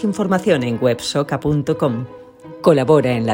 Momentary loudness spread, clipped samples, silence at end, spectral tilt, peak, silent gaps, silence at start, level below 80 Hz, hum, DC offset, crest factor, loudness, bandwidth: 6 LU; under 0.1%; 0 s; -6.5 dB/octave; 0 dBFS; none; 0 s; -48 dBFS; none; under 0.1%; 16 dB; -17 LUFS; 16.5 kHz